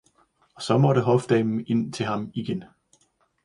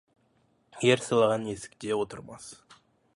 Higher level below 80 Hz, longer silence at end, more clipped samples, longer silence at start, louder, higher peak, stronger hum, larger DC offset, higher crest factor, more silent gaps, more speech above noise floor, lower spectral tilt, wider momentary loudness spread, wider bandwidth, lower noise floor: about the same, -62 dBFS vs -66 dBFS; first, 0.8 s vs 0.6 s; neither; second, 0.6 s vs 0.75 s; first, -24 LUFS vs -27 LUFS; about the same, -6 dBFS vs -8 dBFS; neither; neither; about the same, 18 dB vs 22 dB; neither; about the same, 43 dB vs 41 dB; first, -7 dB/octave vs -4.5 dB/octave; second, 12 LU vs 21 LU; about the same, 11 kHz vs 11.5 kHz; about the same, -66 dBFS vs -68 dBFS